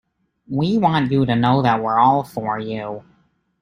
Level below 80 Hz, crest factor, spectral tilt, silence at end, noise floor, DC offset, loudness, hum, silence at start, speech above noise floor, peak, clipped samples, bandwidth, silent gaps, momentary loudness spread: -52 dBFS; 18 dB; -8 dB/octave; 0.6 s; -61 dBFS; under 0.1%; -18 LUFS; none; 0.5 s; 44 dB; -2 dBFS; under 0.1%; 15.5 kHz; none; 12 LU